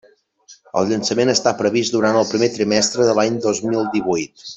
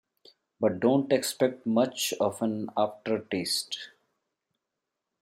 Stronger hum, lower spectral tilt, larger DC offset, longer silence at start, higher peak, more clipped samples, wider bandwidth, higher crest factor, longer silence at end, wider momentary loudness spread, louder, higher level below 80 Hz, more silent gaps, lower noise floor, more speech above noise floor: neither; about the same, -4 dB/octave vs -4 dB/octave; neither; about the same, 0.5 s vs 0.6 s; first, -2 dBFS vs -10 dBFS; neither; second, 8.4 kHz vs 16.5 kHz; about the same, 16 dB vs 20 dB; second, 0 s vs 1.35 s; about the same, 5 LU vs 7 LU; first, -18 LUFS vs -28 LUFS; first, -58 dBFS vs -76 dBFS; neither; second, -49 dBFS vs -86 dBFS; second, 32 dB vs 58 dB